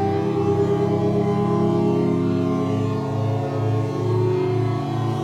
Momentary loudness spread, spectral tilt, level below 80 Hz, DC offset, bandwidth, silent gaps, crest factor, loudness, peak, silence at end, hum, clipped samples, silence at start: 4 LU; -9 dB/octave; -52 dBFS; under 0.1%; 9.6 kHz; none; 12 dB; -21 LUFS; -8 dBFS; 0 s; none; under 0.1%; 0 s